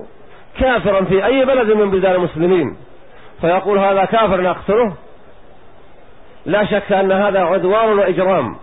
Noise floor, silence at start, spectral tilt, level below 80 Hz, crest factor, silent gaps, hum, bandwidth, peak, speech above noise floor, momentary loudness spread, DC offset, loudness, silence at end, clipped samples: -44 dBFS; 0 s; -11.5 dB/octave; -40 dBFS; 12 dB; none; none; 4 kHz; -4 dBFS; 30 dB; 5 LU; 1%; -15 LUFS; 0.05 s; under 0.1%